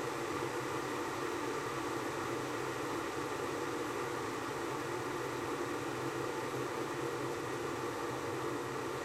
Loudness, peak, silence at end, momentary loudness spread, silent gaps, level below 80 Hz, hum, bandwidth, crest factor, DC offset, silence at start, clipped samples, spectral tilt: -38 LUFS; -24 dBFS; 0 s; 1 LU; none; -68 dBFS; none; 16.5 kHz; 14 dB; under 0.1%; 0 s; under 0.1%; -4.5 dB/octave